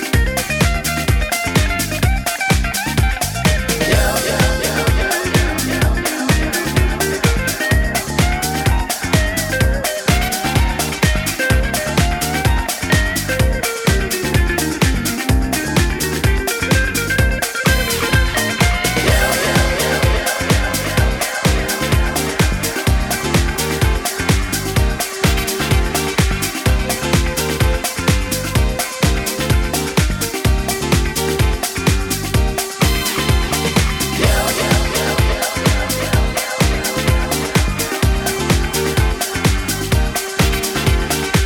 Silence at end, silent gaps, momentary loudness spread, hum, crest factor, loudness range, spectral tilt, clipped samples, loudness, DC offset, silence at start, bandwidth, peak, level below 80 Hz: 0 s; none; 3 LU; none; 14 dB; 2 LU; -4 dB/octave; under 0.1%; -17 LUFS; under 0.1%; 0 s; 20 kHz; -2 dBFS; -22 dBFS